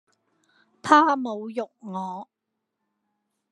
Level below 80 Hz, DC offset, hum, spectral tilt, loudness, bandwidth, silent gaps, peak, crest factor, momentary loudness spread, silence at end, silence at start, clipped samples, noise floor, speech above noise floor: -80 dBFS; under 0.1%; none; -4.5 dB/octave; -23 LUFS; 11 kHz; none; -2 dBFS; 24 dB; 18 LU; 1.25 s; 0.85 s; under 0.1%; -81 dBFS; 58 dB